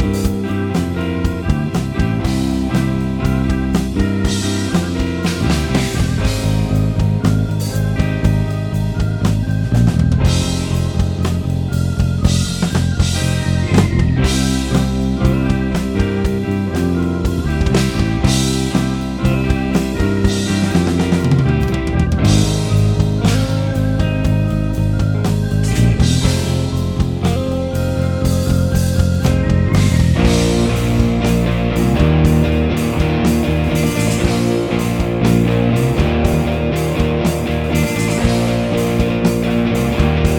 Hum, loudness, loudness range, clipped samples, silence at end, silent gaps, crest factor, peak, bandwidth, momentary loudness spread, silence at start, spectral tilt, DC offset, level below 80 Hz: none; -16 LUFS; 3 LU; under 0.1%; 0 s; none; 14 dB; 0 dBFS; 19.5 kHz; 5 LU; 0 s; -6.5 dB/octave; under 0.1%; -24 dBFS